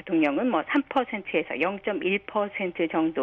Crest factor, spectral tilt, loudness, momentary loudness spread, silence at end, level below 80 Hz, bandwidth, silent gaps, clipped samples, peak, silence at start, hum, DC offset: 16 dB; -7.5 dB/octave; -26 LUFS; 4 LU; 0 s; -64 dBFS; 4.3 kHz; none; under 0.1%; -10 dBFS; 0.05 s; none; under 0.1%